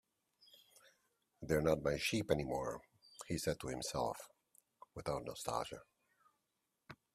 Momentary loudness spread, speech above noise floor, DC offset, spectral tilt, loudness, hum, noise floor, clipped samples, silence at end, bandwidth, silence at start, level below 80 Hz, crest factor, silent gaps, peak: 20 LU; 47 dB; under 0.1%; -4.5 dB/octave; -40 LUFS; none; -86 dBFS; under 0.1%; 0.2 s; 15.5 kHz; 1.4 s; -62 dBFS; 24 dB; none; -20 dBFS